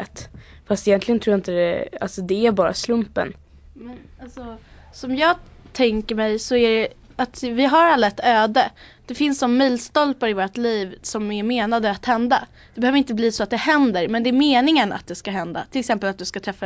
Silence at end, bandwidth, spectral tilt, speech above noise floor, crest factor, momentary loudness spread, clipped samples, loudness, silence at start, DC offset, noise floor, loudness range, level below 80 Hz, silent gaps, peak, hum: 0 s; 8 kHz; -4.5 dB/octave; 20 dB; 16 dB; 13 LU; under 0.1%; -20 LUFS; 0 s; under 0.1%; -40 dBFS; 6 LU; -48 dBFS; none; -4 dBFS; none